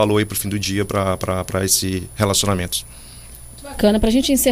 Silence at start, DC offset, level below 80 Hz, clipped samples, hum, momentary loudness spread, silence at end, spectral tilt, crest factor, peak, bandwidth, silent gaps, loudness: 0 s; under 0.1%; -34 dBFS; under 0.1%; none; 21 LU; 0 s; -4 dB/octave; 18 dB; -2 dBFS; 15.5 kHz; none; -19 LUFS